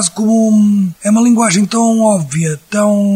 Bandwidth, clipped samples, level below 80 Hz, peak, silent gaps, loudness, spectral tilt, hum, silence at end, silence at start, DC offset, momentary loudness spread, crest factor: 15 kHz; under 0.1%; -56 dBFS; 0 dBFS; none; -12 LUFS; -5 dB/octave; none; 0 s; 0 s; under 0.1%; 5 LU; 10 dB